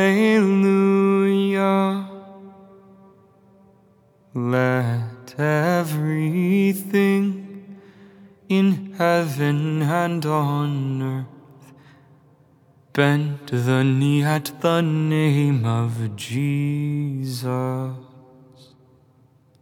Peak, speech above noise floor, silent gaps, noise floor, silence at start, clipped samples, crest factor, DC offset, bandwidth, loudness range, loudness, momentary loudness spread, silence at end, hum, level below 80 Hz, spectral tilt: -2 dBFS; 36 dB; none; -56 dBFS; 0 s; under 0.1%; 20 dB; under 0.1%; 19.5 kHz; 6 LU; -21 LUFS; 11 LU; 1.55 s; none; -76 dBFS; -7 dB/octave